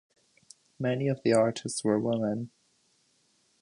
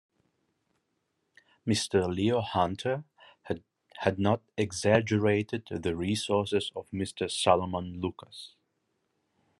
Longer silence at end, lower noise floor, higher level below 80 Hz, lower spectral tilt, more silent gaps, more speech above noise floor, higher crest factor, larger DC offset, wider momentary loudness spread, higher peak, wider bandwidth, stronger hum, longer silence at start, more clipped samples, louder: about the same, 1.15 s vs 1.1 s; second, -69 dBFS vs -79 dBFS; about the same, -70 dBFS vs -66 dBFS; about the same, -5.5 dB/octave vs -5 dB/octave; neither; second, 42 dB vs 50 dB; second, 18 dB vs 24 dB; neither; second, 9 LU vs 13 LU; second, -12 dBFS vs -8 dBFS; second, 11 kHz vs 12.5 kHz; neither; second, 0.8 s vs 1.65 s; neither; about the same, -29 LUFS vs -29 LUFS